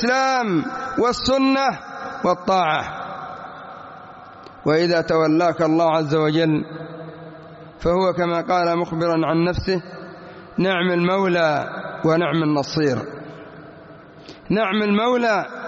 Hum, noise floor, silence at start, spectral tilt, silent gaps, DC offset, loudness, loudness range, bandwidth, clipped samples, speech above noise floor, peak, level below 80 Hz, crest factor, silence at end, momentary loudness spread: none; -42 dBFS; 0 s; -4.5 dB/octave; none; under 0.1%; -20 LUFS; 3 LU; 7.6 kHz; under 0.1%; 23 dB; -6 dBFS; -48 dBFS; 14 dB; 0 s; 20 LU